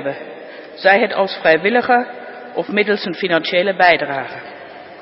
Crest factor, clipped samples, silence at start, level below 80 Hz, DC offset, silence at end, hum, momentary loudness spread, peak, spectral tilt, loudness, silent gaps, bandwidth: 18 dB; under 0.1%; 0 s; -64 dBFS; under 0.1%; 0 s; none; 20 LU; 0 dBFS; -8 dB/octave; -16 LUFS; none; 5.8 kHz